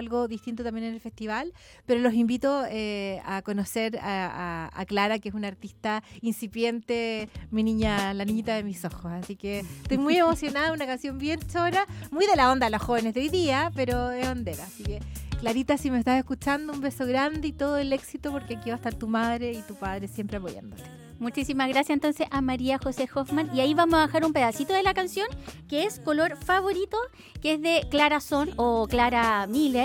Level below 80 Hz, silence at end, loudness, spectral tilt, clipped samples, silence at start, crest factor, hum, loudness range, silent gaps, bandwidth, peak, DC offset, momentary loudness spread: -46 dBFS; 0 s; -27 LUFS; -5 dB/octave; under 0.1%; 0 s; 18 dB; none; 5 LU; none; 17.5 kHz; -8 dBFS; under 0.1%; 12 LU